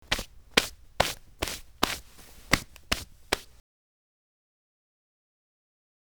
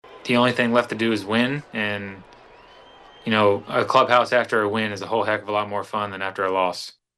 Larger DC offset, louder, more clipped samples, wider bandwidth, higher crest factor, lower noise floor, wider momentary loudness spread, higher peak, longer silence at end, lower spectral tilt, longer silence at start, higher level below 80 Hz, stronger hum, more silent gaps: first, 0.1% vs under 0.1%; second, -30 LUFS vs -21 LUFS; neither; first, over 20 kHz vs 12.5 kHz; first, 28 dB vs 20 dB; about the same, -51 dBFS vs -48 dBFS; about the same, 9 LU vs 9 LU; about the same, -6 dBFS vs -4 dBFS; first, 2.65 s vs 0.25 s; second, -2 dB/octave vs -5 dB/octave; about the same, 0.1 s vs 0.05 s; first, -46 dBFS vs -64 dBFS; neither; neither